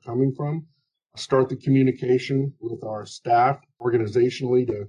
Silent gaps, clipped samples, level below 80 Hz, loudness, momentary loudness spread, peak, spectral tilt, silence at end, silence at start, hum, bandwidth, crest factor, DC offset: none; under 0.1%; -60 dBFS; -23 LUFS; 12 LU; -8 dBFS; -7.5 dB/octave; 0 s; 0.05 s; none; 10 kHz; 14 dB; under 0.1%